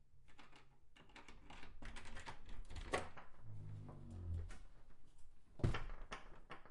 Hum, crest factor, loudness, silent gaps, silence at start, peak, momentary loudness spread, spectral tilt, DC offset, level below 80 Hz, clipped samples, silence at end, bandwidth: none; 26 dB; -51 LUFS; none; 0 s; -22 dBFS; 22 LU; -5.5 dB/octave; under 0.1%; -54 dBFS; under 0.1%; 0 s; 11.5 kHz